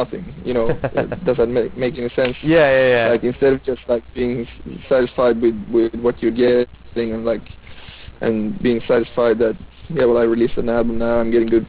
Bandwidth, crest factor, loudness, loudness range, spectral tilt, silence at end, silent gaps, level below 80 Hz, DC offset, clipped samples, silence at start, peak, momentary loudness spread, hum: 4 kHz; 14 dB; -18 LUFS; 3 LU; -10.5 dB/octave; 0 s; none; -40 dBFS; under 0.1%; under 0.1%; 0 s; -4 dBFS; 10 LU; none